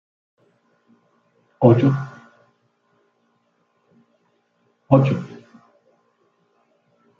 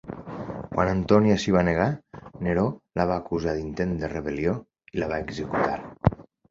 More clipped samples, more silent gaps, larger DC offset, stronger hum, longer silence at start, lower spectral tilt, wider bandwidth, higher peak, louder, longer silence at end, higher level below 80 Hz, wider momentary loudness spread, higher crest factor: neither; neither; neither; neither; first, 1.6 s vs 0.05 s; first, -10 dB/octave vs -7 dB/octave; second, 6.6 kHz vs 7.6 kHz; about the same, 0 dBFS vs -2 dBFS; first, -18 LUFS vs -26 LUFS; first, 1.85 s vs 0.3 s; second, -62 dBFS vs -44 dBFS; first, 23 LU vs 15 LU; about the same, 24 dB vs 24 dB